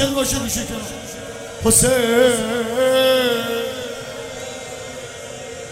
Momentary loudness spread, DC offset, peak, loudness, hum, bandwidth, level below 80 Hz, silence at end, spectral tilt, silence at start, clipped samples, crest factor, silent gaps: 17 LU; under 0.1%; -2 dBFS; -17 LUFS; none; 16 kHz; -42 dBFS; 0 s; -3 dB/octave; 0 s; under 0.1%; 18 dB; none